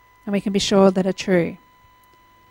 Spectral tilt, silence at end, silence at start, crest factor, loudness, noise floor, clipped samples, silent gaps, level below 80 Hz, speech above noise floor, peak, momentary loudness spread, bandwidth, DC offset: -5.5 dB/octave; 0.95 s; 0.25 s; 18 dB; -19 LUFS; -53 dBFS; under 0.1%; none; -54 dBFS; 35 dB; -4 dBFS; 10 LU; 12.5 kHz; under 0.1%